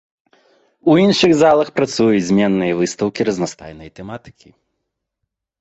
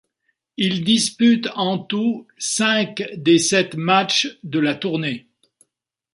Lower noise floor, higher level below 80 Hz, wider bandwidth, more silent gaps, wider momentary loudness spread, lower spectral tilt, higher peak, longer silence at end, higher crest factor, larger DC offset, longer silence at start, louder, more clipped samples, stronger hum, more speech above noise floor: about the same, -78 dBFS vs -78 dBFS; first, -52 dBFS vs -64 dBFS; second, 8.2 kHz vs 11.5 kHz; neither; first, 21 LU vs 9 LU; first, -5.5 dB/octave vs -3.5 dB/octave; about the same, -2 dBFS vs -2 dBFS; first, 1.3 s vs 0.95 s; about the same, 16 dB vs 18 dB; neither; first, 0.85 s vs 0.6 s; first, -15 LUFS vs -19 LUFS; neither; neither; about the same, 62 dB vs 59 dB